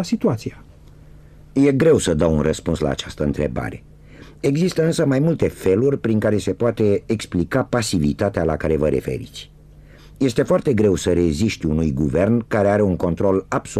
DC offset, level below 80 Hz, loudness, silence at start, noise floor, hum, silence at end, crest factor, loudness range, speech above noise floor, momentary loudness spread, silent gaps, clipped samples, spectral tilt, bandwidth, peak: under 0.1%; -38 dBFS; -19 LUFS; 0 s; -44 dBFS; none; 0 s; 14 dB; 3 LU; 25 dB; 7 LU; none; under 0.1%; -6.5 dB/octave; 14.5 kHz; -6 dBFS